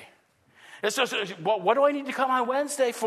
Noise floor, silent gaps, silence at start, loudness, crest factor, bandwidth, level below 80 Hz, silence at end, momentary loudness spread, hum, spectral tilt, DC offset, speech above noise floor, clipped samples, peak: -61 dBFS; none; 0 s; -25 LUFS; 18 dB; 13.5 kHz; -84 dBFS; 0 s; 6 LU; none; -3 dB/octave; under 0.1%; 36 dB; under 0.1%; -8 dBFS